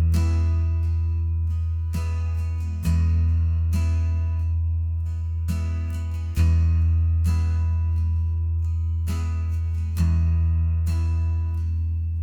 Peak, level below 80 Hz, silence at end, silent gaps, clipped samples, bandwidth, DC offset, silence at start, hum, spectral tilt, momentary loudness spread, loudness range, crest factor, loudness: -10 dBFS; -30 dBFS; 0 s; none; under 0.1%; 7.8 kHz; under 0.1%; 0 s; none; -7.5 dB/octave; 5 LU; 1 LU; 12 dB; -24 LUFS